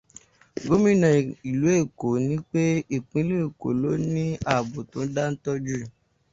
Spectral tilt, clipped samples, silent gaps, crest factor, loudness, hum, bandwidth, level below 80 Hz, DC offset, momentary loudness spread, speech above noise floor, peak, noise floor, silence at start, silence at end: -7 dB/octave; under 0.1%; none; 18 dB; -25 LUFS; none; 7.8 kHz; -54 dBFS; under 0.1%; 12 LU; 28 dB; -6 dBFS; -52 dBFS; 0.55 s; 0.45 s